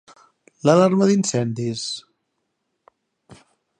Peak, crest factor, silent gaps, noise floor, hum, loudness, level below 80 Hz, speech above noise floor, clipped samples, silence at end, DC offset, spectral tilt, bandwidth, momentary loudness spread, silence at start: -2 dBFS; 22 dB; none; -75 dBFS; none; -19 LUFS; -66 dBFS; 57 dB; under 0.1%; 0.45 s; under 0.1%; -5.5 dB/octave; 9.8 kHz; 13 LU; 0.65 s